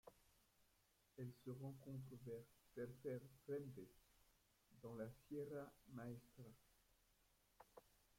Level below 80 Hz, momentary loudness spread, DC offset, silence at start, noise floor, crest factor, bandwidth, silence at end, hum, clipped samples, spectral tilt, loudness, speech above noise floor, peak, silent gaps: -82 dBFS; 14 LU; under 0.1%; 0.05 s; -81 dBFS; 18 dB; 16.5 kHz; 0.3 s; none; under 0.1%; -7.5 dB/octave; -56 LUFS; 26 dB; -40 dBFS; none